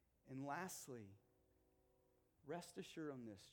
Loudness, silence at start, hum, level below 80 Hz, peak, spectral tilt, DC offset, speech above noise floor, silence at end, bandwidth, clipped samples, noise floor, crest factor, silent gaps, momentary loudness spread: -53 LUFS; 0.25 s; none; -86 dBFS; -34 dBFS; -4.5 dB/octave; under 0.1%; 27 dB; 0 s; 19 kHz; under 0.1%; -80 dBFS; 20 dB; none; 10 LU